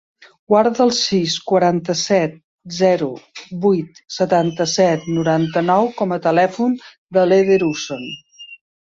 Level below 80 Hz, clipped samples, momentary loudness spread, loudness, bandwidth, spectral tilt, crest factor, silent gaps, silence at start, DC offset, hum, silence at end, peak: -60 dBFS; under 0.1%; 15 LU; -17 LUFS; 7.8 kHz; -5 dB/octave; 16 dB; 2.44-2.58 s, 6.98-7.07 s; 0.5 s; under 0.1%; none; 0.3 s; -2 dBFS